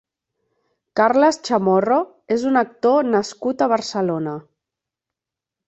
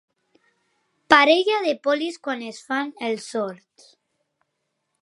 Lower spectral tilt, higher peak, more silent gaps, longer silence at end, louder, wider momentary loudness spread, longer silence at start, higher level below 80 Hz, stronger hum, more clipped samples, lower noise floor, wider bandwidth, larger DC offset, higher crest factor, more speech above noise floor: first, -5.5 dB/octave vs -3 dB/octave; about the same, -2 dBFS vs 0 dBFS; neither; second, 1.3 s vs 1.5 s; about the same, -19 LUFS vs -21 LUFS; second, 9 LU vs 15 LU; second, 0.95 s vs 1.1 s; about the same, -66 dBFS vs -68 dBFS; neither; neither; first, -86 dBFS vs -77 dBFS; second, 8.2 kHz vs 11.5 kHz; neither; second, 18 dB vs 24 dB; first, 68 dB vs 55 dB